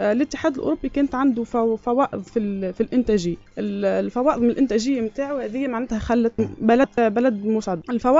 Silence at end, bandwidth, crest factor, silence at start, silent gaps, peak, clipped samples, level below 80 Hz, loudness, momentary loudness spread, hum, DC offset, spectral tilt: 0 s; 7.8 kHz; 18 dB; 0 s; none; -4 dBFS; under 0.1%; -46 dBFS; -22 LUFS; 7 LU; none; under 0.1%; -5.5 dB/octave